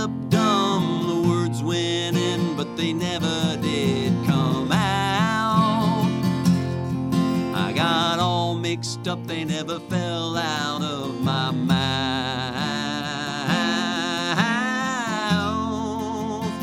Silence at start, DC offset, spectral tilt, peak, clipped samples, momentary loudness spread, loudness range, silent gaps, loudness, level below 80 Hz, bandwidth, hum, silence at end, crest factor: 0 s; under 0.1%; -5 dB/octave; -6 dBFS; under 0.1%; 7 LU; 3 LU; none; -23 LUFS; -52 dBFS; 16 kHz; none; 0 s; 16 dB